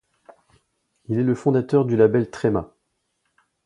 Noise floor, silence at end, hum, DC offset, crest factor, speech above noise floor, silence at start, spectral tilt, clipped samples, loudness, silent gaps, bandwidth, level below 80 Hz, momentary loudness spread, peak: -73 dBFS; 1 s; none; under 0.1%; 20 dB; 54 dB; 1.1 s; -9 dB/octave; under 0.1%; -21 LUFS; none; 10.5 kHz; -54 dBFS; 7 LU; -4 dBFS